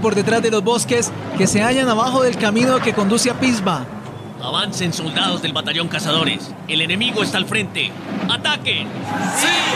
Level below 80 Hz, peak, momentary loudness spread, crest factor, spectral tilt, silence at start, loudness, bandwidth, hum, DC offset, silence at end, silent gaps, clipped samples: -52 dBFS; -4 dBFS; 7 LU; 14 dB; -3.5 dB/octave; 0 s; -18 LUFS; 14.5 kHz; none; under 0.1%; 0 s; none; under 0.1%